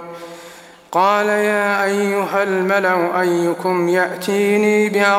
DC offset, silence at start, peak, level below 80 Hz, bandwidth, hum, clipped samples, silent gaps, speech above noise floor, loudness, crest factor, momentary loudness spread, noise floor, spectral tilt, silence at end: under 0.1%; 0 s; -2 dBFS; -68 dBFS; 16 kHz; none; under 0.1%; none; 24 dB; -17 LUFS; 16 dB; 6 LU; -40 dBFS; -5 dB/octave; 0 s